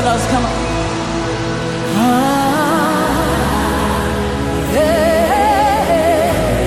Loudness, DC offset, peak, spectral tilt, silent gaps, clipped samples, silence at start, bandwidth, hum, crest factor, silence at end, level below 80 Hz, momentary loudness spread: -15 LUFS; under 0.1%; -2 dBFS; -5 dB/octave; none; under 0.1%; 0 s; 17 kHz; none; 12 dB; 0 s; -28 dBFS; 6 LU